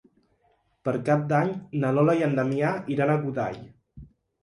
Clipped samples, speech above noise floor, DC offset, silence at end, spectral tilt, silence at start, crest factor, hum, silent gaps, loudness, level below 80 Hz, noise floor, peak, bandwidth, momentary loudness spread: under 0.1%; 43 dB; under 0.1%; 0.35 s; -8.5 dB/octave; 0.85 s; 18 dB; none; none; -25 LUFS; -60 dBFS; -68 dBFS; -10 dBFS; 11 kHz; 9 LU